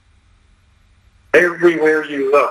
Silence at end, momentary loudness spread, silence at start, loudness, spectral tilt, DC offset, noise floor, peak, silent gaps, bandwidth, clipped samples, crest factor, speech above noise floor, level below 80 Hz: 0 s; 3 LU; 1.35 s; -14 LUFS; -5.5 dB/octave; under 0.1%; -53 dBFS; 0 dBFS; none; 14 kHz; under 0.1%; 16 dB; 39 dB; -56 dBFS